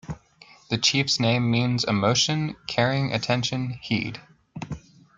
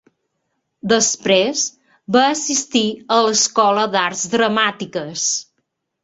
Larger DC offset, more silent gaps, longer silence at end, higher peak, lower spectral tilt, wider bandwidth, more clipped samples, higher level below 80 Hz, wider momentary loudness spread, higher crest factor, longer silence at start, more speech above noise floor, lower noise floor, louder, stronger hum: neither; neither; second, 0.4 s vs 0.6 s; second, -6 dBFS vs -2 dBFS; first, -4.5 dB/octave vs -2 dB/octave; about the same, 9.2 kHz vs 8.4 kHz; neither; first, -56 dBFS vs -62 dBFS; first, 19 LU vs 7 LU; about the same, 20 dB vs 18 dB; second, 0.05 s vs 0.85 s; second, 29 dB vs 55 dB; second, -53 dBFS vs -72 dBFS; second, -23 LUFS vs -17 LUFS; neither